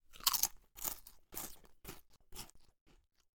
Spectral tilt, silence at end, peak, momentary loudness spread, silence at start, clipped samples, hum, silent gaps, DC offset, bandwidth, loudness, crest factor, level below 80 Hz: 0.5 dB/octave; 0.4 s; -12 dBFS; 22 LU; 0.1 s; under 0.1%; none; 2.81-2.86 s; under 0.1%; 19 kHz; -38 LUFS; 32 dB; -62 dBFS